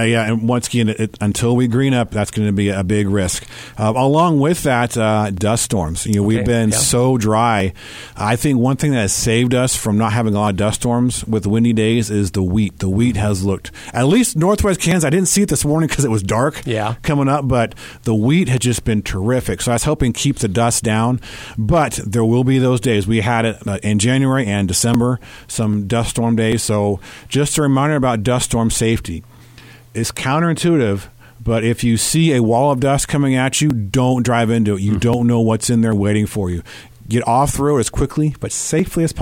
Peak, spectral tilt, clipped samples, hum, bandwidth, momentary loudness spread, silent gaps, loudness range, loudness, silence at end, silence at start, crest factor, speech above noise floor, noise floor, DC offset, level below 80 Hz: -2 dBFS; -5 dB/octave; under 0.1%; none; 17 kHz; 7 LU; none; 2 LU; -16 LUFS; 0 s; 0 s; 14 dB; 25 dB; -41 dBFS; under 0.1%; -36 dBFS